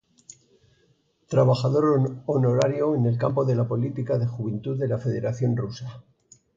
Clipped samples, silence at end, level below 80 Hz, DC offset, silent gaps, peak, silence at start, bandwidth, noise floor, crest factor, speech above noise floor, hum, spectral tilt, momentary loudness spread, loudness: under 0.1%; 0.55 s; -60 dBFS; under 0.1%; none; -8 dBFS; 1.3 s; 7.6 kHz; -65 dBFS; 16 dB; 42 dB; none; -8 dB/octave; 8 LU; -24 LUFS